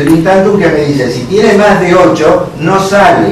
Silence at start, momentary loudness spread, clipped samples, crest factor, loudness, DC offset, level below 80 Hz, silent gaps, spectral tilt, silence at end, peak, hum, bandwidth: 0 s; 5 LU; 3%; 6 dB; -7 LUFS; under 0.1%; -34 dBFS; none; -6 dB/octave; 0 s; 0 dBFS; none; 14 kHz